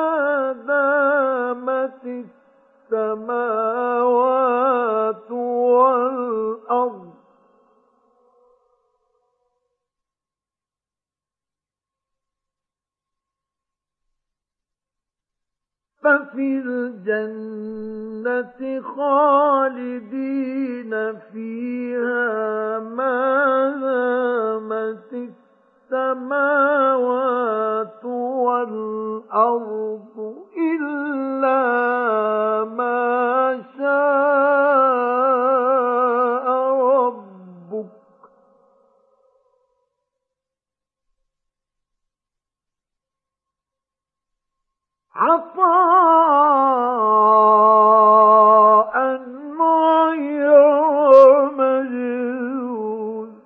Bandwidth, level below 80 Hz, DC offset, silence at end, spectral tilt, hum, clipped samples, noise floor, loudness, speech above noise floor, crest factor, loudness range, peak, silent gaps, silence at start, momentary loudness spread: 4.5 kHz; -76 dBFS; under 0.1%; 0.1 s; -8 dB/octave; none; under 0.1%; under -90 dBFS; -18 LUFS; over 70 dB; 18 dB; 11 LU; 0 dBFS; none; 0 s; 16 LU